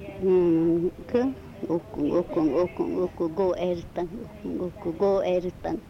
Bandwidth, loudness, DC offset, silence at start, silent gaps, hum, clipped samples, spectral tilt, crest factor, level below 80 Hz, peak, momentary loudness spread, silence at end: 6.6 kHz; -26 LUFS; under 0.1%; 0 s; none; none; under 0.1%; -8.5 dB/octave; 14 dB; -50 dBFS; -12 dBFS; 11 LU; 0 s